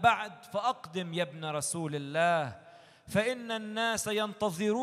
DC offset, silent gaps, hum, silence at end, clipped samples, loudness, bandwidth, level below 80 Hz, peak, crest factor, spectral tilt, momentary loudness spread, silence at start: under 0.1%; none; none; 0 s; under 0.1%; -32 LUFS; 15 kHz; -68 dBFS; -10 dBFS; 22 dB; -4 dB/octave; 8 LU; 0 s